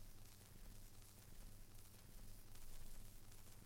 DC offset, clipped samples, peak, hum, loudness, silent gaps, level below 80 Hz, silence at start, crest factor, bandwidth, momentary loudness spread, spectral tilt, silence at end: under 0.1%; under 0.1%; -38 dBFS; none; -63 LUFS; none; -60 dBFS; 0 s; 16 dB; 16.5 kHz; 2 LU; -3.5 dB/octave; 0 s